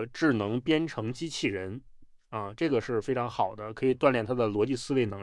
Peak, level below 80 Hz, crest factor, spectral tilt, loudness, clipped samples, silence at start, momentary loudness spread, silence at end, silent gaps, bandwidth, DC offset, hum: -8 dBFS; -60 dBFS; 22 dB; -6 dB/octave; -29 LUFS; under 0.1%; 0 s; 11 LU; 0 s; none; 11.5 kHz; under 0.1%; none